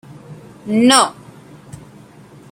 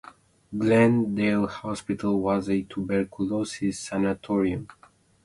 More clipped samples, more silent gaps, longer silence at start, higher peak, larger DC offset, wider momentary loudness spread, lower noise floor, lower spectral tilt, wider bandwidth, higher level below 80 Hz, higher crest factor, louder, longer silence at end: neither; neither; second, 0.3 s vs 0.5 s; first, 0 dBFS vs -6 dBFS; neither; first, 27 LU vs 10 LU; second, -42 dBFS vs -48 dBFS; second, -3 dB/octave vs -6.5 dB/octave; first, 16.5 kHz vs 11.5 kHz; about the same, -58 dBFS vs -54 dBFS; about the same, 20 dB vs 20 dB; first, -13 LUFS vs -25 LUFS; first, 1.4 s vs 0.55 s